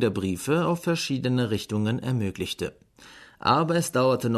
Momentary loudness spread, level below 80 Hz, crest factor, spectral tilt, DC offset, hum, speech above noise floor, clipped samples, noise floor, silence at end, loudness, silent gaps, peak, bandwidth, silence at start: 8 LU; -58 dBFS; 18 dB; -5.5 dB/octave; under 0.1%; none; 25 dB; under 0.1%; -50 dBFS; 0 s; -26 LUFS; none; -6 dBFS; 13.5 kHz; 0 s